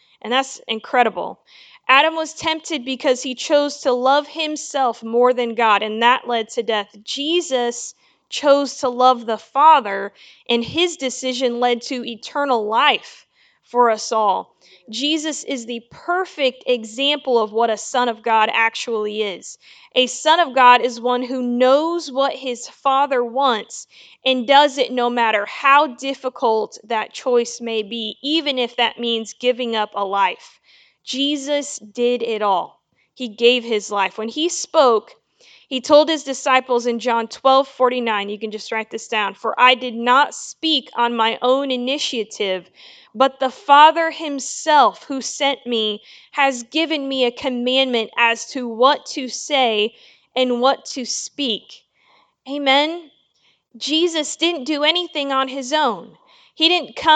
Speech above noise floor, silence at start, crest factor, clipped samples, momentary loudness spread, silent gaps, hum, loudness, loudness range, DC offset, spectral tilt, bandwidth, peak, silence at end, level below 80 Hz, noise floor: 43 dB; 0.25 s; 20 dB; under 0.1%; 11 LU; none; none; -18 LUFS; 4 LU; under 0.1%; -1.5 dB/octave; 9.4 kHz; 0 dBFS; 0 s; -70 dBFS; -62 dBFS